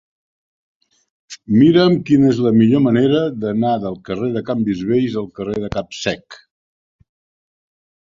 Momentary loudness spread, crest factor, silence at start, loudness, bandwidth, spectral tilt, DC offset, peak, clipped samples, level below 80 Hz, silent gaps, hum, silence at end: 12 LU; 16 dB; 1.3 s; -16 LUFS; 7.6 kHz; -7 dB/octave; under 0.1%; -2 dBFS; under 0.1%; -50 dBFS; none; none; 1.8 s